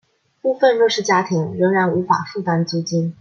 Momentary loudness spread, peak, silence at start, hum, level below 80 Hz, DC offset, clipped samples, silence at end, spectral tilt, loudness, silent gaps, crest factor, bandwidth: 7 LU; -2 dBFS; 0.45 s; none; -66 dBFS; under 0.1%; under 0.1%; 0.1 s; -5.5 dB/octave; -18 LUFS; none; 16 dB; 7.4 kHz